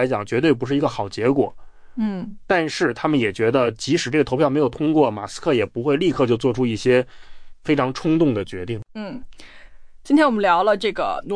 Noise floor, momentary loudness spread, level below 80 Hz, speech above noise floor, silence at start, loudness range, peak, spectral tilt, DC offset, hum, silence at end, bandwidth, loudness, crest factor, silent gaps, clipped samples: -40 dBFS; 12 LU; -48 dBFS; 20 dB; 0 s; 3 LU; -6 dBFS; -6 dB/octave; under 0.1%; none; 0 s; 10.5 kHz; -20 LUFS; 16 dB; none; under 0.1%